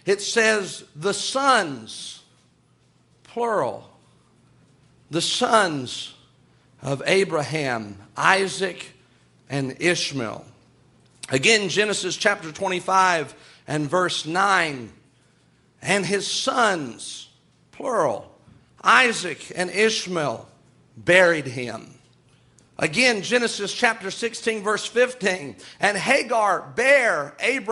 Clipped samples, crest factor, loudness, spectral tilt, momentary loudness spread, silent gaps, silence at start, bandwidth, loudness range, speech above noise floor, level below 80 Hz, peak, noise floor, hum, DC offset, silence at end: under 0.1%; 22 dB; -21 LUFS; -3 dB/octave; 16 LU; none; 0.05 s; 11.5 kHz; 5 LU; 38 dB; -66 dBFS; -2 dBFS; -60 dBFS; none; under 0.1%; 0 s